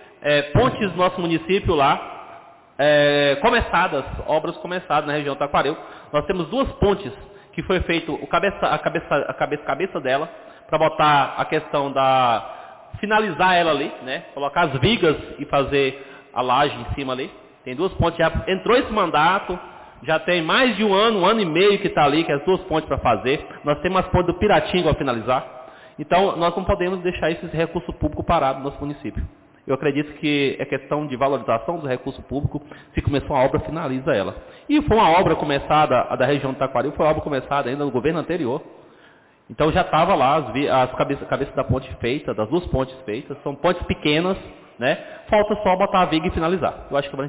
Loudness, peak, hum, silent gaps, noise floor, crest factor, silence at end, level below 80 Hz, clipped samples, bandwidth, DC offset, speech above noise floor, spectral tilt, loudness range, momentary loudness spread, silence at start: -21 LUFS; -8 dBFS; none; none; -52 dBFS; 14 dB; 0 s; -40 dBFS; under 0.1%; 4 kHz; under 0.1%; 32 dB; -10 dB/octave; 5 LU; 12 LU; 0.2 s